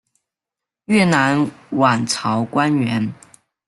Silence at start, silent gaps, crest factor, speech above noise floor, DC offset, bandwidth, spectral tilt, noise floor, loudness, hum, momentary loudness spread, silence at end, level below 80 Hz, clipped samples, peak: 0.9 s; none; 18 dB; 69 dB; under 0.1%; 12 kHz; -5 dB/octave; -86 dBFS; -18 LUFS; none; 7 LU; 0.55 s; -58 dBFS; under 0.1%; -2 dBFS